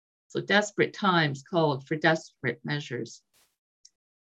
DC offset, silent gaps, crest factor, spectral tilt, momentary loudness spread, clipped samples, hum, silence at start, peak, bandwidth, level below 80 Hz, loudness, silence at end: under 0.1%; none; 22 dB; -5 dB/octave; 12 LU; under 0.1%; none; 0.35 s; -8 dBFS; 8.8 kHz; -74 dBFS; -27 LUFS; 1.1 s